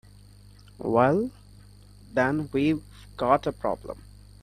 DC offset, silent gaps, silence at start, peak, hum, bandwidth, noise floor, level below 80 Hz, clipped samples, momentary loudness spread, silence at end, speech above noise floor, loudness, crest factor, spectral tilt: under 0.1%; none; 0.8 s; -6 dBFS; 50 Hz at -45 dBFS; 14 kHz; -51 dBFS; -52 dBFS; under 0.1%; 14 LU; 0.4 s; 26 dB; -26 LUFS; 22 dB; -7.5 dB/octave